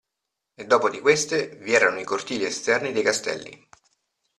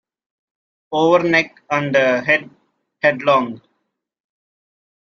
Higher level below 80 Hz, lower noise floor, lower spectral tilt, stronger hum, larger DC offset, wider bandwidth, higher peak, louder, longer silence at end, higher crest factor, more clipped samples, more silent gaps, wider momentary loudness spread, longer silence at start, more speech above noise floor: about the same, -68 dBFS vs -64 dBFS; first, -83 dBFS vs -72 dBFS; second, -2.5 dB/octave vs -5.5 dB/octave; neither; neither; first, 13 kHz vs 7.2 kHz; about the same, -4 dBFS vs -2 dBFS; second, -22 LUFS vs -17 LUFS; second, 0.85 s vs 1.55 s; about the same, 20 dB vs 18 dB; neither; neither; first, 11 LU vs 7 LU; second, 0.6 s vs 0.9 s; first, 60 dB vs 56 dB